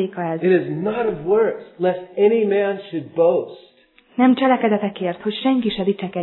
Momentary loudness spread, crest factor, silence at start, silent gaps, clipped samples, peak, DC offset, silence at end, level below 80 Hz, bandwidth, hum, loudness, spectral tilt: 8 LU; 16 dB; 0 s; none; under 0.1%; -4 dBFS; under 0.1%; 0 s; -58 dBFS; 4.2 kHz; none; -19 LUFS; -10.5 dB/octave